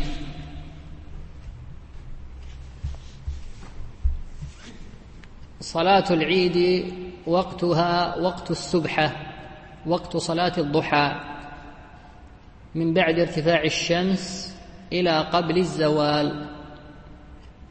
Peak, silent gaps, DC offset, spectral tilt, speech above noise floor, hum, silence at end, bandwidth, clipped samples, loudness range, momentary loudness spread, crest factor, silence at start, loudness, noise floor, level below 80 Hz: -4 dBFS; none; under 0.1%; -5.5 dB/octave; 24 dB; none; 0.05 s; 8.8 kHz; under 0.1%; 15 LU; 23 LU; 20 dB; 0 s; -23 LUFS; -46 dBFS; -40 dBFS